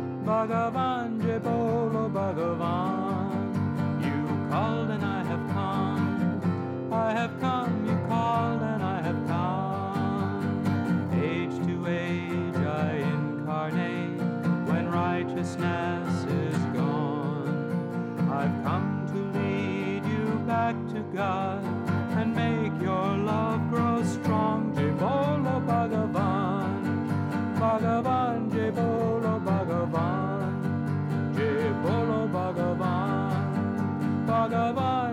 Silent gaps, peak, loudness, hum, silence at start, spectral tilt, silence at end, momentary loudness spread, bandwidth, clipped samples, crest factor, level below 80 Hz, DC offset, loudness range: none; -14 dBFS; -28 LUFS; none; 0 s; -8 dB/octave; 0 s; 4 LU; 12.5 kHz; under 0.1%; 12 dB; -66 dBFS; under 0.1%; 2 LU